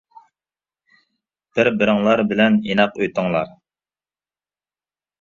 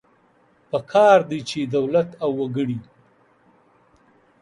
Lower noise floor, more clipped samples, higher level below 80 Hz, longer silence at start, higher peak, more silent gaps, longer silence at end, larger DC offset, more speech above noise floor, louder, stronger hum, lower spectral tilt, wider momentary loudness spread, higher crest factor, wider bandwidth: first, under -90 dBFS vs -59 dBFS; neither; first, -58 dBFS vs -66 dBFS; first, 1.55 s vs 0.75 s; about the same, 0 dBFS vs -2 dBFS; neither; first, 1.75 s vs 1.6 s; neither; first, over 73 dB vs 39 dB; about the same, -18 LUFS vs -20 LUFS; neither; about the same, -6.5 dB/octave vs -6 dB/octave; second, 8 LU vs 14 LU; about the same, 22 dB vs 22 dB; second, 7.2 kHz vs 11 kHz